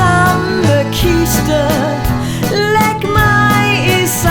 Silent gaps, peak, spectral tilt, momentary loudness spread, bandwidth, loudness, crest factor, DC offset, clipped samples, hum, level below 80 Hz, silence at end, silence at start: none; 0 dBFS; -5 dB/octave; 6 LU; 19.5 kHz; -12 LUFS; 12 dB; under 0.1%; under 0.1%; none; -26 dBFS; 0 s; 0 s